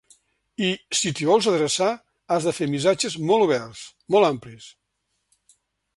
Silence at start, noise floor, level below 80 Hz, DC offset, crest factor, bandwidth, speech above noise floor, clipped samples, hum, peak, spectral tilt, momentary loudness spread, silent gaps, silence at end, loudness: 0.6 s; -75 dBFS; -64 dBFS; under 0.1%; 20 dB; 11.5 kHz; 53 dB; under 0.1%; none; -4 dBFS; -4 dB/octave; 16 LU; none; 1.25 s; -22 LUFS